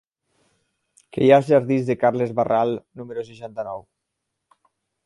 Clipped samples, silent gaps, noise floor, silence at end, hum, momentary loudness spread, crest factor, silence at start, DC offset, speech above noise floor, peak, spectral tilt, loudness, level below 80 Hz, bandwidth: under 0.1%; none; -79 dBFS; 1.25 s; none; 18 LU; 22 dB; 1.15 s; under 0.1%; 59 dB; -2 dBFS; -8 dB/octave; -20 LUFS; -64 dBFS; 11.5 kHz